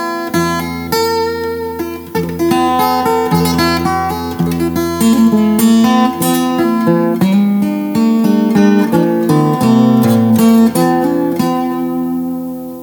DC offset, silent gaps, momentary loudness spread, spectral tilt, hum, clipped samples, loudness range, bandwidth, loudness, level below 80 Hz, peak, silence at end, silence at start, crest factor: under 0.1%; none; 9 LU; -6 dB/octave; none; under 0.1%; 4 LU; over 20 kHz; -13 LUFS; -42 dBFS; 0 dBFS; 0 s; 0 s; 12 dB